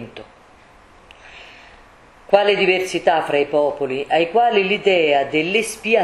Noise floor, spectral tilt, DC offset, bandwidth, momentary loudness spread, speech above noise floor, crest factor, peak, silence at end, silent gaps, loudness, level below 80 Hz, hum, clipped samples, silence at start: -48 dBFS; -4 dB/octave; under 0.1%; 13 kHz; 4 LU; 31 dB; 18 dB; 0 dBFS; 0 s; none; -17 LUFS; -56 dBFS; none; under 0.1%; 0 s